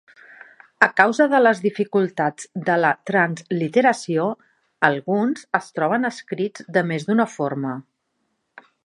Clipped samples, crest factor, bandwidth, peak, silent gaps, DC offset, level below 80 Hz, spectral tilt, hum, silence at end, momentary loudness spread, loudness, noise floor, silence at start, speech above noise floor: under 0.1%; 20 dB; 11.5 kHz; 0 dBFS; none; under 0.1%; -72 dBFS; -6 dB/octave; none; 1.05 s; 11 LU; -20 LUFS; -73 dBFS; 0.8 s; 53 dB